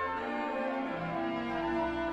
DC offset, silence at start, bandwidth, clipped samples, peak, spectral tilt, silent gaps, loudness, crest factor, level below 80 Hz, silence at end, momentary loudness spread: under 0.1%; 0 s; 8.2 kHz; under 0.1%; -22 dBFS; -7 dB/octave; none; -34 LUFS; 12 dB; -56 dBFS; 0 s; 2 LU